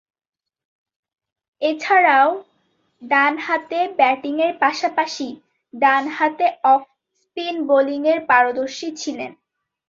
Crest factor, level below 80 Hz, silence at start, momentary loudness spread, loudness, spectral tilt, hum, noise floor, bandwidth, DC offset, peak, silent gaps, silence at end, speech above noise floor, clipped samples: 18 dB; -70 dBFS; 1.6 s; 13 LU; -18 LUFS; -2.5 dB/octave; none; -66 dBFS; 7.6 kHz; under 0.1%; -2 dBFS; none; 0.55 s; 47 dB; under 0.1%